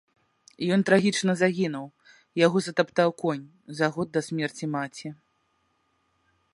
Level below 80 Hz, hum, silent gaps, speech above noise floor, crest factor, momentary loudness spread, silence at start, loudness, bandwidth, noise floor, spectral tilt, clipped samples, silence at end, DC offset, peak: -72 dBFS; none; none; 46 dB; 22 dB; 15 LU; 0.6 s; -26 LUFS; 11.5 kHz; -71 dBFS; -5.5 dB/octave; under 0.1%; 1.4 s; under 0.1%; -6 dBFS